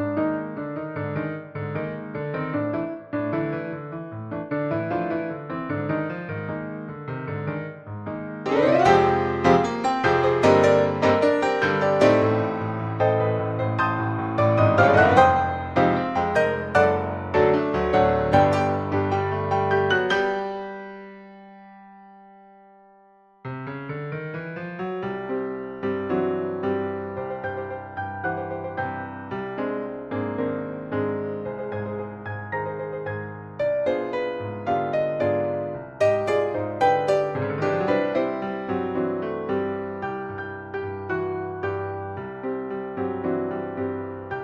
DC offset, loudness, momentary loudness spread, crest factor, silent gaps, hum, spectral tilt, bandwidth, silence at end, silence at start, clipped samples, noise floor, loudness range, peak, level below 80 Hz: under 0.1%; -24 LUFS; 14 LU; 20 dB; none; none; -7 dB/octave; 10 kHz; 0 s; 0 s; under 0.1%; -55 dBFS; 11 LU; -4 dBFS; -52 dBFS